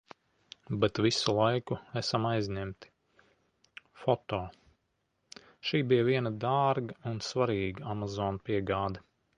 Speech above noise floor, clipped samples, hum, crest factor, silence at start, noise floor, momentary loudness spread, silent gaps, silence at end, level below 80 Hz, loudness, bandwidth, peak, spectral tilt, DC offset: 48 dB; under 0.1%; none; 22 dB; 0.7 s; -78 dBFS; 12 LU; none; 0.4 s; -58 dBFS; -31 LUFS; 10.5 kHz; -12 dBFS; -5.5 dB/octave; under 0.1%